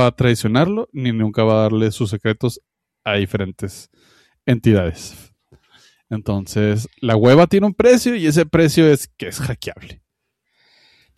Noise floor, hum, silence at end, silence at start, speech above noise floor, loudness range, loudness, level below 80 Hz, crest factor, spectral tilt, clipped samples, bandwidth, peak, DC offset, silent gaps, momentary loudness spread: -74 dBFS; none; 1.25 s; 0 s; 58 dB; 7 LU; -17 LUFS; -46 dBFS; 16 dB; -6.5 dB/octave; under 0.1%; 14 kHz; -2 dBFS; under 0.1%; none; 15 LU